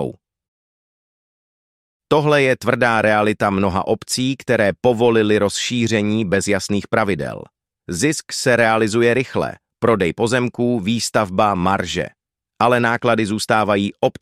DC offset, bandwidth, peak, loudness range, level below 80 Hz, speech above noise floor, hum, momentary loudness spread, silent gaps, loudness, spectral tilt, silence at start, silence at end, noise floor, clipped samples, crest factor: under 0.1%; 15.5 kHz; -2 dBFS; 2 LU; -50 dBFS; over 73 dB; none; 6 LU; 0.48-2.00 s; -18 LUFS; -5 dB/octave; 0 s; 0.1 s; under -90 dBFS; under 0.1%; 16 dB